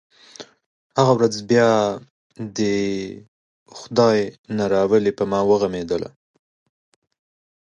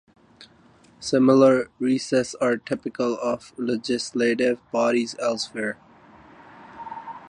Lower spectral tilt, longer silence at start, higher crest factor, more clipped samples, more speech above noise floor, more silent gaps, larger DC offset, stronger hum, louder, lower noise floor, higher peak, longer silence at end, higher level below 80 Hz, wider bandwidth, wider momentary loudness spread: about the same, -5.5 dB/octave vs -5 dB/octave; about the same, 0.4 s vs 0.4 s; about the same, 18 dB vs 20 dB; neither; second, 24 dB vs 32 dB; first, 0.66-0.90 s, 2.10-2.30 s, 3.28-3.66 s, 4.38-4.44 s vs none; neither; neither; first, -20 LUFS vs -23 LUFS; second, -43 dBFS vs -55 dBFS; about the same, -2 dBFS vs -4 dBFS; first, 1.6 s vs 0 s; first, -56 dBFS vs -64 dBFS; about the same, 10 kHz vs 10.5 kHz; first, 19 LU vs 16 LU